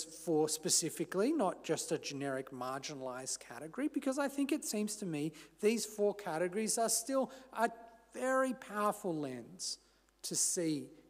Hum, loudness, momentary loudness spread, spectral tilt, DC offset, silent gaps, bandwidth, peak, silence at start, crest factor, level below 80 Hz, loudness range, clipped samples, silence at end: none; -36 LUFS; 10 LU; -3 dB/octave; under 0.1%; none; 16 kHz; -18 dBFS; 0 s; 20 dB; -78 dBFS; 3 LU; under 0.1%; 0.1 s